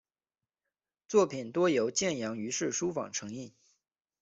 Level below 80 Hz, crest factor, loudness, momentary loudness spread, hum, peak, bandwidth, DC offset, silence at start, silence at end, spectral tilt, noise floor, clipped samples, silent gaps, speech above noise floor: -74 dBFS; 20 dB; -31 LUFS; 12 LU; none; -14 dBFS; 8.2 kHz; under 0.1%; 1.1 s; 0.75 s; -3.5 dB/octave; under -90 dBFS; under 0.1%; none; over 59 dB